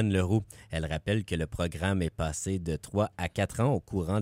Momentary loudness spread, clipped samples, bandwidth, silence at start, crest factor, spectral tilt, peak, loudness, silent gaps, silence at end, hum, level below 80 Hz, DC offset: 6 LU; under 0.1%; 16 kHz; 0 s; 14 dB; -6 dB/octave; -14 dBFS; -31 LUFS; none; 0 s; none; -46 dBFS; under 0.1%